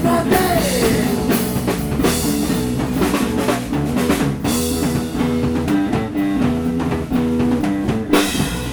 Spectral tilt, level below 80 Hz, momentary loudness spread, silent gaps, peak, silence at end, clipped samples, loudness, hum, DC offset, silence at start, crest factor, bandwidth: -5 dB/octave; -32 dBFS; 4 LU; none; 0 dBFS; 0 s; under 0.1%; -18 LUFS; none; under 0.1%; 0 s; 18 dB; over 20 kHz